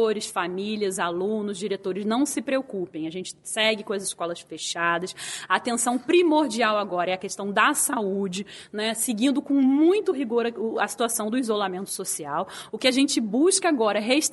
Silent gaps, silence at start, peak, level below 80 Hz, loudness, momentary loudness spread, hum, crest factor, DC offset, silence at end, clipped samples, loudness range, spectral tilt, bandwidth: none; 0 s; -4 dBFS; -70 dBFS; -24 LUFS; 11 LU; none; 20 dB; under 0.1%; 0 s; under 0.1%; 4 LU; -3 dB/octave; 12 kHz